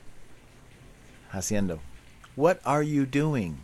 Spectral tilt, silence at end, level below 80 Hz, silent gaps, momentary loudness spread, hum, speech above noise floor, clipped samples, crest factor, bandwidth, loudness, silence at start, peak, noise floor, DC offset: -6 dB/octave; 0 s; -50 dBFS; none; 15 LU; none; 26 dB; under 0.1%; 20 dB; 13 kHz; -27 LUFS; 0.05 s; -8 dBFS; -52 dBFS; under 0.1%